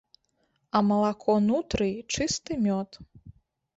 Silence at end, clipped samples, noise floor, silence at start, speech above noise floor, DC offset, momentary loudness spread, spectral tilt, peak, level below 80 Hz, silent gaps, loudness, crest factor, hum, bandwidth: 0.45 s; under 0.1%; -73 dBFS; 0.75 s; 47 dB; under 0.1%; 5 LU; -5 dB/octave; -10 dBFS; -52 dBFS; none; -26 LUFS; 18 dB; none; 8 kHz